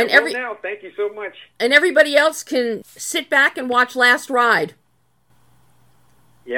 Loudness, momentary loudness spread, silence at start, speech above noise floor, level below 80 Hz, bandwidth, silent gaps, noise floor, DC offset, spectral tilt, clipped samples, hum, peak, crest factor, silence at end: -17 LUFS; 14 LU; 0 s; 47 dB; -68 dBFS; 17.5 kHz; none; -64 dBFS; under 0.1%; -2 dB/octave; under 0.1%; none; 0 dBFS; 20 dB; 0 s